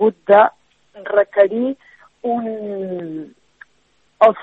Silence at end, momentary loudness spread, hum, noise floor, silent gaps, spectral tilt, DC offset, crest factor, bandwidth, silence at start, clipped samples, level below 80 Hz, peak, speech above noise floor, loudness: 0 s; 18 LU; none; -60 dBFS; none; -7.5 dB/octave; under 0.1%; 18 dB; 4.1 kHz; 0 s; under 0.1%; -72 dBFS; 0 dBFS; 43 dB; -17 LUFS